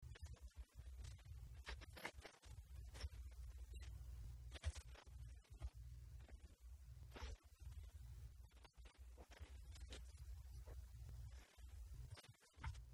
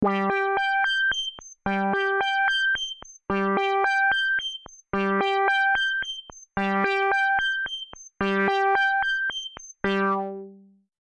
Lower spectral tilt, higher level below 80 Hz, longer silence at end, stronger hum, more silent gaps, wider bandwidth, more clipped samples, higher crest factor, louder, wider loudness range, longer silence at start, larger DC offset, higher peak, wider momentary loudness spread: about the same, -4.5 dB/octave vs -4 dB/octave; about the same, -58 dBFS vs -56 dBFS; second, 0 s vs 0.5 s; neither; neither; first, 16.5 kHz vs 10 kHz; neither; first, 20 dB vs 14 dB; second, -59 LUFS vs -24 LUFS; first, 4 LU vs 1 LU; about the same, 0 s vs 0 s; neither; second, -36 dBFS vs -10 dBFS; second, 8 LU vs 12 LU